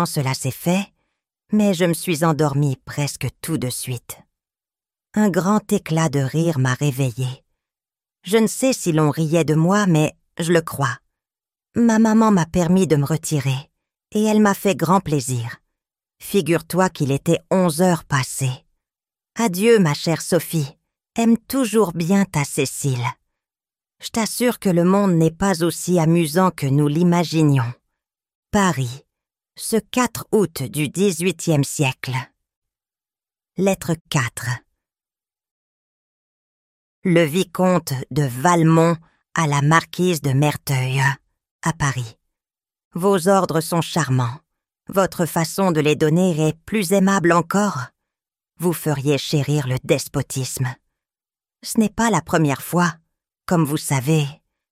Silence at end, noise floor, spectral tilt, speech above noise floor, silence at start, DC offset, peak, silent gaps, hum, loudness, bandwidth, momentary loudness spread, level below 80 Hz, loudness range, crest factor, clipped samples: 0.35 s; under -90 dBFS; -5.5 dB/octave; over 71 dB; 0 s; under 0.1%; 0 dBFS; 28.35-28.43 s, 32.56-32.62 s, 34.01-34.05 s, 35.51-37.02 s, 41.51-41.59 s, 42.85-42.91 s; none; -19 LUFS; 16 kHz; 11 LU; -52 dBFS; 5 LU; 20 dB; under 0.1%